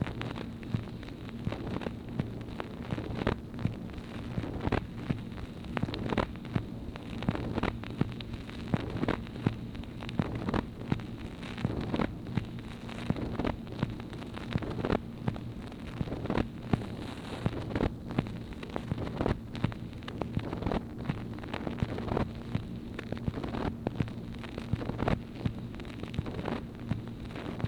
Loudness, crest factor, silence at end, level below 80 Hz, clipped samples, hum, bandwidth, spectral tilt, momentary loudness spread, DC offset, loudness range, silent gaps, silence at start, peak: -36 LUFS; 26 dB; 0 s; -46 dBFS; under 0.1%; none; 14.5 kHz; -7.5 dB/octave; 8 LU; under 0.1%; 1 LU; none; 0 s; -10 dBFS